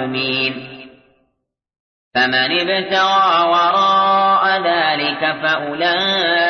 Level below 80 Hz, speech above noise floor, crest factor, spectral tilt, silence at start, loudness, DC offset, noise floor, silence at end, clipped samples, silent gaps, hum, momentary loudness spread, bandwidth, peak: -62 dBFS; 57 dB; 14 dB; -4 dB/octave; 0 s; -15 LUFS; under 0.1%; -72 dBFS; 0 s; under 0.1%; 1.80-2.11 s; none; 5 LU; 6.6 kHz; -4 dBFS